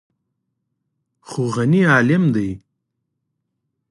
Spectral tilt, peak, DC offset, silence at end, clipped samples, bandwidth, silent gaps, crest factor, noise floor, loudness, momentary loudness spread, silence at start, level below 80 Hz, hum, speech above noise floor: -7 dB/octave; -2 dBFS; under 0.1%; 1.35 s; under 0.1%; 11.5 kHz; none; 20 dB; -76 dBFS; -17 LUFS; 15 LU; 1.3 s; -54 dBFS; none; 60 dB